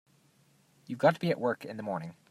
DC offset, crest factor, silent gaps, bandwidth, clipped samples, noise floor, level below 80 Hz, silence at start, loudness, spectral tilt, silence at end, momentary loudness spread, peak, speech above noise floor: under 0.1%; 22 dB; none; 15 kHz; under 0.1%; -66 dBFS; -78 dBFS; 0.9 s; -31 LUFS; -7 dB/octave; 0.2 s; 11 LU; -10 dBFS; 35 dB